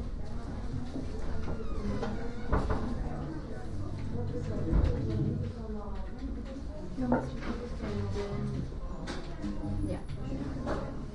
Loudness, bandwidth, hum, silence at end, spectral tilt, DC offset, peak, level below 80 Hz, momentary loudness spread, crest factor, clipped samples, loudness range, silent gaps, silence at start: -36 LUFS; 10.5 kHz; none; 0 s; -8 dB/octave; under 0.1%; -14 dBFS; -38 dBFS; 9 LU; 18 dB; under 0.1%; 3 LU; none; 0 s